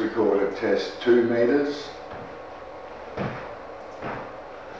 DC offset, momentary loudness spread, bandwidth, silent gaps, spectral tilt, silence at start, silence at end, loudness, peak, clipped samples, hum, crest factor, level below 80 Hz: 0.2%; 18 LU; 7.8 kHz; none; -6.5 dB/octave; 0 s; 0 s; -25 LUFS; -10 dBFS; under 0.1%; none; 16 dB; -58 dBFS